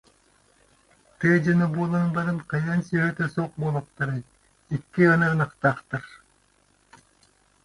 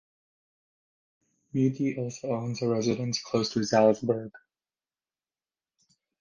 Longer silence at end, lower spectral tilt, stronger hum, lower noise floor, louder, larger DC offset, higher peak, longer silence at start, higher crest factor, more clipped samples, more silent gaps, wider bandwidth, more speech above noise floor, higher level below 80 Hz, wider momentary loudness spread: second, 1.5 s vs 1.85 s; first, -8 dB/octave vs -5.5 dB/octave; neither; second, -63 dBFS vs under -90 dBFS; first, -24 LUFS vs -28 LUFS; neither; about the same, -6 dBFS vs -8 dBFS; second, 1.2 s vs 1.55 s; about the same, 20 dB vs 22 dB; neither; neither; about the same, 11 kHz vs 10 kHz; second, 40 dB vs over 63 dB; first, -60 dBFS vs -68 dBFS; first, 13 LU vs 10 LU